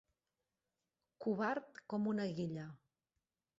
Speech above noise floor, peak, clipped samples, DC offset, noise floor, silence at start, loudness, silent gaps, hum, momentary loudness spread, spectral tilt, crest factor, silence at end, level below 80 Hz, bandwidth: over 50 dB; -26 dBFS; under 0.1%; under 0.1%; under -90 dBFS; 1.2 s; -41 LUFS; none; none; 8 LU; -6 dB/octave; 18 dB; 0.8 s; -82 dBFS; 7.6 kHz